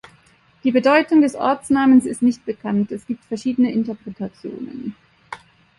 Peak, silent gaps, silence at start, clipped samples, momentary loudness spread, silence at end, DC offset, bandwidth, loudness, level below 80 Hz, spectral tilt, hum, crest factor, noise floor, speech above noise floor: -2 dBFS; none; 0.65 s; under 0.1%; 18 LU; 0.45 s; under 0.1%; 11.5 kHz; -18 LUFS; -58 dBFS; -6 dB/octave; none; 18 dB; -55 dBFS; 36 dB